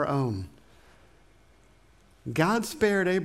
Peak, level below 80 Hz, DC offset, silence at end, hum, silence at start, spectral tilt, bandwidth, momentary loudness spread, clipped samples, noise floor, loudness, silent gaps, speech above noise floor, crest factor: -10 dBFS; -58 dBFS; under 0.1%; 0 s; none; 0 s; -6 dB/octave; 16 kHz; 16 LU; under 0.1%; -59 dBFS; -27 LUFS; none; 33 dB; 20 dB